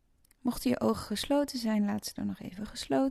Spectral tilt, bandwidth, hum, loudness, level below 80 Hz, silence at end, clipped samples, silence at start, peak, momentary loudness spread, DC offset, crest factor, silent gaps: -5 dB/octave; 13.5 kHz; none; -32 LUFS; -56 dBFS; 0 s; under 0.1%; 0.45 s; -14 dBFS; 9 LU; under 0.1%; 16 dB; none